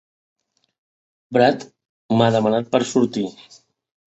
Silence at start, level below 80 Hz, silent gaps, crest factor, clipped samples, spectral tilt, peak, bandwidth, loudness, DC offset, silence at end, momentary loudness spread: 1.3 s; -62 dBFS; 1.89-2.09 s; 20 dB; under 0.1%; -6 dB/octave; -2 dBFS; 8.2 kHz; -19 LUFS; under 0.1%; 0.8 s; 10 LU